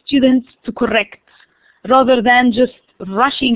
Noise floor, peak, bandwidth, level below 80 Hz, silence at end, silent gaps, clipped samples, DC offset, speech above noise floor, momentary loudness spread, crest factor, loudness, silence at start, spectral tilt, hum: -52 dBFS; -2 dBFS; 4 kHz; -48 dBFS; 0 s; none; under 0.1%; under 0.1%; 38 dB; 16 LU; 14 dB; -14 LUFS; 0.1 s; -8.5 dB/octave; none